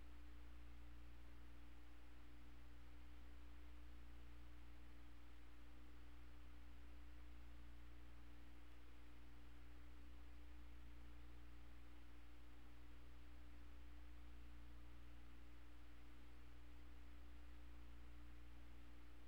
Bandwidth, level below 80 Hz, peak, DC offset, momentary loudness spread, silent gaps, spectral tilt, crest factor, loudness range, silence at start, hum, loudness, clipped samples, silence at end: 19.5 kHz; -62 dBFS; -48 dBFS; 0.2%; 2 LU; none; -6 dB/octave; 10 dB; 0 LU; 0 s; 60 Hz at -65 dBFS; -65 LUFS; under 0.1%; 0 s